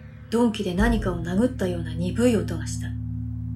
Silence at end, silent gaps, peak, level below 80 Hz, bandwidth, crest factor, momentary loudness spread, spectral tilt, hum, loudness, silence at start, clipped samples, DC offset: 0 s; none; -8 dBFS; -34 dBFS; 13.5 kHz; 16 dB; 9 LU; -6.5 dB/octave; none; -25 LUFS; 0 s; under 0.1%; under 0.1%